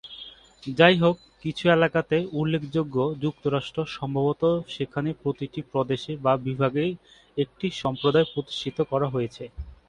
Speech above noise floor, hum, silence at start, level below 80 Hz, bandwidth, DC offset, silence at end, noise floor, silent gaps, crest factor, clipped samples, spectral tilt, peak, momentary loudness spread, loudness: 21 dB; none; 0.05 s; -52 dBFS; 10 kHz; under 0.1%; 0.15 s; -45 dBFS; none; 22 dB; under 0.1%; -7 dB/octave; -2 dBFS; 13 LU; -25 LUFS